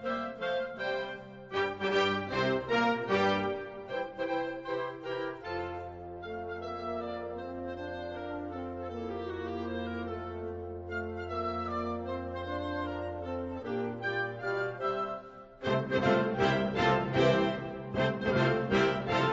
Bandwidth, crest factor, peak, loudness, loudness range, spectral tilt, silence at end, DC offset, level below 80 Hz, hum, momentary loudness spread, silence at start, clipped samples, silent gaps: 7.8 kHz; 18 dB; -14 dBFS; -33 LUFS; 9 LU; -6.5 dB/octave; 0 s; under 0.1%; -56 dBFS; none; 11 LU; 0 s; under 0.1%; none